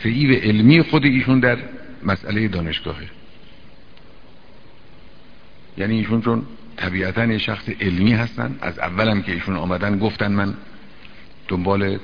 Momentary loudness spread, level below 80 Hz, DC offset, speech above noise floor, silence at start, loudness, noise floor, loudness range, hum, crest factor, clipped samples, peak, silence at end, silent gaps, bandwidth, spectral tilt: 13 LU; -44 dBFS; 1%; 28 dB; 0 s; -19 LUFS; -47 dBFS; 10 LU; none; 20 dB; under 0.1%; 0 dBFS; 0 s; none; 5.4 kHz; -8.5 dB/octave